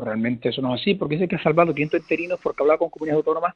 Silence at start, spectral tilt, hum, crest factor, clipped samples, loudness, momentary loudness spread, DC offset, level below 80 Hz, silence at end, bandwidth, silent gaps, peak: 0 s; -8 dB/octave; none; 20 dB; under 0.1%; -22 LUFS; 5 LU; under 0.1%; -58 dBFS; 0.05 s; 6.8 kHz; none; -2 dBFS